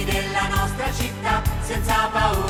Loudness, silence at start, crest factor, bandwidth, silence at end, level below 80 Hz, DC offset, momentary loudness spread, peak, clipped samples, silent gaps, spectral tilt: -22 LUFS; 0 s; 16 dB; 18.5 kHz; 0 s; -28 dBFS; under 0.1%; 5 LU; -6 dBFS; under 0.1%; none; -4.5 dB/octave